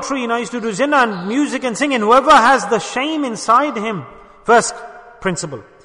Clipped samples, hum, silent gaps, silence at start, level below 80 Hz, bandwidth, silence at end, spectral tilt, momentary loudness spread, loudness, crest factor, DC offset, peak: under 0.1%; none; none; 0 s; -52 dBFS; 11 kHz; 0.2 s; -3.5 dB/octave; 14 LU; -15 LUFS; 16 dB; under 0.1%; 0 dBFS